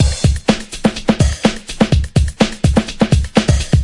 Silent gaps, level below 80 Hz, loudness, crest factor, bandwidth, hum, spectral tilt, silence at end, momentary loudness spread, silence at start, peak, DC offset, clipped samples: none; -22 dBFS; -15 LUFS; 14 dB; 11.5 kHz; none; -5.5 dB/octave; 0 s; 4 LU; 0 s; 0 dBFS; under 0.1%; under 0.1%